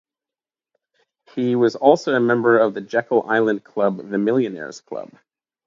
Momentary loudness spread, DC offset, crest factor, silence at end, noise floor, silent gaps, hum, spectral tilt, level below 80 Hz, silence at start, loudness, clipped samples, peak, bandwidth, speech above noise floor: 17 LU; under 0.1%; 20 dB; 0.6 s; under -90 dBFS; none; none; -6.5 dB/octave; -72 dBFS; 1.35 s; -19 LUFS; under 0.1%; 0 dBFS; 7.6 kHz; over 71 dB